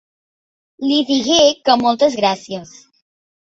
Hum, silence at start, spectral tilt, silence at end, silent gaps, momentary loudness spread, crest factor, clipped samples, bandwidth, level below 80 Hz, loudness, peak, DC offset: none; 0.8 s; -3 dB/octave; 0.95 s; none; 13 LU; 18 dB; under 0.1%; 8 kHz; -58 dBFS; -15 LUFS; 0 dBFS; under 0.1%